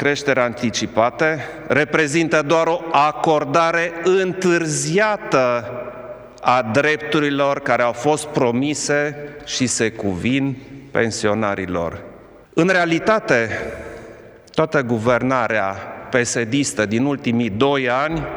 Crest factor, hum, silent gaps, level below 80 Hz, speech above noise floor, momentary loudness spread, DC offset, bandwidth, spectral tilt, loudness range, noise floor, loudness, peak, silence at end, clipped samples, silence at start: 18 dB; none; none; -50 dBFS; 23 dB; 9 LU; under 0.1%; over 20 kHz; -4.5 dB/octave; 3 LU; -41 dBFS; -19 LUFS; 0 dBFS; 0 s; under 0.1%; 0 s